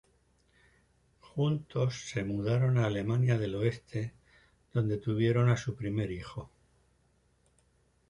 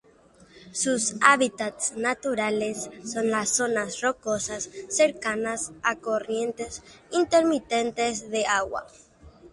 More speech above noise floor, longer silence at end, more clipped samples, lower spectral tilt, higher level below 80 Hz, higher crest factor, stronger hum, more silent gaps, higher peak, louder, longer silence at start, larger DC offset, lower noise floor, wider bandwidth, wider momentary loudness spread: first, 40 dB vs 30 dB; first, 1.65 s vs 0.05 s; neither; first, -7.5 dB/octave vs -2.5 dB/octave; about the same, -58 dBFS vs -60 dBFS; second, 18 dB vs 26 dB; neither; neither; second, -16 dBFS vs 0 dBFS; second, -31 LUFS vs -25 LUFS; first, 1.35 s vs 0.55 s; neither; first, -70 dBFS vs -56 dBFS; about the same, 10.5 kHz vs 11.5 kHz; about the same, 11 LU vs 11 LU